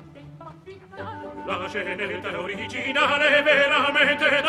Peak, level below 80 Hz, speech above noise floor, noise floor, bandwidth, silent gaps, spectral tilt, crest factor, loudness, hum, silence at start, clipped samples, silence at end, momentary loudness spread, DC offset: -6 dBFS; -60 dBFS; 21 dB; -43 dBFS; 12.5 kHz; none; -3.5 dB/octave; 18 dB; -21 LUFS; none; 0 s; under 0.1%; 0 s; 18 LU; under 0.1%